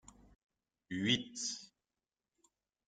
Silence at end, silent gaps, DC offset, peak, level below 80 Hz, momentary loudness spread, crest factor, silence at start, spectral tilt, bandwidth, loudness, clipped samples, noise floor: 1.2 s; none; under 0.1%; -18 dBFS; -74 dBFS; 12 LU; 26 dB; 0.9 s; -3 dB/octave; 10 kHz; -37 LUFS; under 0.1%; under -90 dBFS